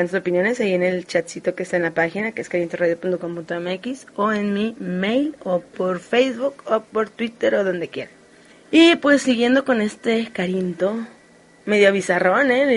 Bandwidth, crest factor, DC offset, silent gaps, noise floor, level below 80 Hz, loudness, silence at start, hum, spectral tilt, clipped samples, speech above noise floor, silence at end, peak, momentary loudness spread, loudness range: 11.5 kHz; 18 dB; under 0.1%; none; -50 dBFS; -64 dBFS; -20 LUFS; 0 s; none; -5 dB/octave; under 0.1%; 31 dB; 0 s; -2 dBFS; 11 LU; 5 LU